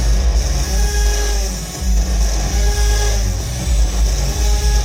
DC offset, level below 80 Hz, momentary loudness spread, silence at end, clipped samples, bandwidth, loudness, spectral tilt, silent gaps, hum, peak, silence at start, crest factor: under 0.1%; -16 dBFS; 4 LU; 0 s; under 0.1%; 16 kHz; -18 LUFS; -3.5 dB/octave; none; none; -4 dBFS; 0 s; 10 dB